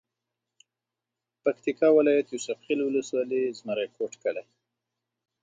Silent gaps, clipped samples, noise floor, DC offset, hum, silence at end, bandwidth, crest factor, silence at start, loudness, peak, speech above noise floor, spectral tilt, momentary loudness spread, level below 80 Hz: none; under 0.1%; -88 dBFS; under 0.1%; none; 1 s; 9.2 kHz; 18 dB; 1.45 s; -27 LUFS; -10 dBFS; 62 dB; -4.5 dB/octave; 12 LU; -82 dBFS